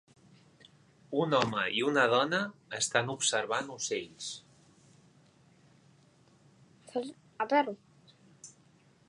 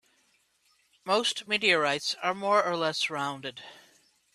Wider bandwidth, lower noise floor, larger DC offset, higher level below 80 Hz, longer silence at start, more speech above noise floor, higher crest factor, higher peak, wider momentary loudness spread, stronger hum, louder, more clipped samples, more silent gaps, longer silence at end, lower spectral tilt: second, 11 kHz vs 14 kHz; second, -64 dBFS vs -69 dBFS; neither; about the same, -76 dBFS vs -78 dBFS; about the same, 1.1 s vs 1.05 s; second, 33 dB vs 41 dB; about the same, 26 dB vs 22 dB; about the same, -8 dBFS vs -8 dBFS; first, 20 LU vs 17 LU; neither; second, -31 LUFS vs -27 LUFS; neither; neither; about the same, 0.6 s vs 0.6 s; about the same, -3 dB/octave vs -2.5 dB/octave